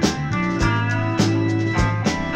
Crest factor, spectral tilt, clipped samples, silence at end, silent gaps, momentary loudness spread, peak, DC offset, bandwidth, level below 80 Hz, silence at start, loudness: 14 dB; -5.5 dB/octave; under 0.1%; 0 s; none; 3 LU; -6 dBFS; under 0.1%; 10 kHz; -34 dBFS; 0 s; -20 LUFS